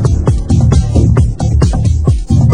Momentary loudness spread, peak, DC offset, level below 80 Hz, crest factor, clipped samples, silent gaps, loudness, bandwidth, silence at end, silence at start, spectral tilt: 3 LU; 0 dBFS; 3%; -14 dBFS; 10 dB; 0.3%; none; -11 LUFS; 10 kHz; 0 s; 0 s; -8 dB/octave